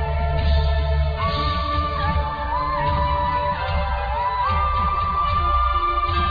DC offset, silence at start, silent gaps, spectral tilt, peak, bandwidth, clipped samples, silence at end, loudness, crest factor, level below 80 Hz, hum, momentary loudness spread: under 0.1%; 0 s; none; -8 dB/octave; -8 dBFS; 5 kHz; under 0.1%; 0 s; -21 LUFS; 12 dB; -24 dBFS; none; 4 LU